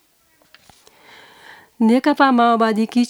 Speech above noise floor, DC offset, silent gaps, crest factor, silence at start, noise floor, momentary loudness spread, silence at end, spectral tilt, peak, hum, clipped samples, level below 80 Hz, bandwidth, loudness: 43 dB; under 0.1%; none; 18 dB; 1.8 s; -58 dBFS; 4 LU; 0 s; -5.5 dB/octave; 0 dBFS; none; under 0.1%; -70 dBFS; 12.5 kHz; -16 LUFS